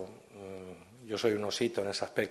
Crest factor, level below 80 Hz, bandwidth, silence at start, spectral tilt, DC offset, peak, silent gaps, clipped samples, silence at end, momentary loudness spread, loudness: 20 dB; -74 dBFS; 12.5 kHz; 0 s; -4 dB/octave; under 0.1%; -16 dBFS; none; under 0.1%; 0 s; 18 LU; -33 LUFS